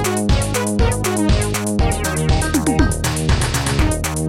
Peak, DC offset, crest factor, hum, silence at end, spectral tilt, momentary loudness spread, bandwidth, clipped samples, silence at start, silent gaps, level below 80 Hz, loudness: -2 dBFS; 0.3%; 14 dB; none; 0 s; -5 dB/octave; 2 LU; 16.5 kHz; under 0.1%; 0 s; none; -22 dBFS; -18 LUFS